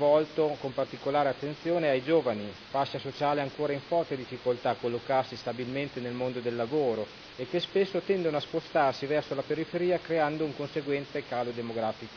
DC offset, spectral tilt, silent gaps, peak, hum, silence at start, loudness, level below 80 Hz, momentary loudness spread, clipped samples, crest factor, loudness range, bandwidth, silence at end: under 0.1%; -6.5 dB/octave; none; -14 dBFS; none; 0 s; -30 LUFS; -66 dBFS; 7 LU; under 0.1%; 16 dB; 2 LU; 5.4 kHz; 0 s